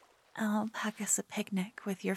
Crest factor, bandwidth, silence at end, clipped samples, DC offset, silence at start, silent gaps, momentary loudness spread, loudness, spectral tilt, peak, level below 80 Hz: 18 dB; 15.5 kHz; 0 s; under 0.1%; under 0.1%; 0.35 s; none; 6 LU; -35 LUFS; -4 dB/octave; -16 dBFS; -86 dBFS